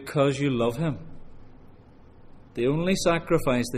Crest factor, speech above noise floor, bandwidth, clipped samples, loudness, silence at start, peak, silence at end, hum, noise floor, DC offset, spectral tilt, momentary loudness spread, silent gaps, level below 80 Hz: 16 dB; 26 dB; 15 kHz; under 0.1%; -25 LUFS; 0 s; -10 dBFS; 0 s; none; -50 dBFS; under 0.1%; -6 dB/octave; 7 LU; none; -44 dBFS